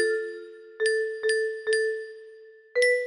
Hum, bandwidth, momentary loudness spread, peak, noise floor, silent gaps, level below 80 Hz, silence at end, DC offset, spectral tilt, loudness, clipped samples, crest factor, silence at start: none; 11 kHz; 17 LU; -10 dBFS; -49 dBFS; none; -76 dBFS; 0 s; under 0.1%; 0 dB/octave; -27 LUFS; under 0.1%; 16 dB; 0 s